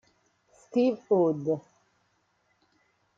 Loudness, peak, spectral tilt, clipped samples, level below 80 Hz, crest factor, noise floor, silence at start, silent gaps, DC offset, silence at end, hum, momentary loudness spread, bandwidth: -27 LUFS; -12 dBFS; -8.5 dB/octave; under 0.1%; -78 dBFS; 18 dB; -72 dBFS; 0.75 s; none; under 0.1%; 1.6 s; none; 7 LU; 7.6 kHz